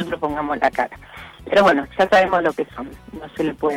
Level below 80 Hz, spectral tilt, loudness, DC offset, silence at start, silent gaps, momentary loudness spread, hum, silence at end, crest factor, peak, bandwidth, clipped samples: -48 dBFS; -5.5 dB/octave; -19 LUFS; under 0.1%; 0 s; none; 21 LU; none; 0 s; 14 dB; -6 dBFS; 16 kHz; under 0.1%